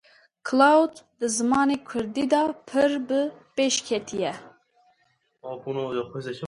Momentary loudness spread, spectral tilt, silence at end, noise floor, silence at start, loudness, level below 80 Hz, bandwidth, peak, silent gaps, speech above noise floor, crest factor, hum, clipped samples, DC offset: 14 LU; -3.5 dB/octave; 0 s; -69 dBFS; 0.45 s; -24 LUFS; -66 dBFS; 11.5 kHz; -6 dBFS; none; 45 dB; 20 dB; none; under 0.1%; under 0.1%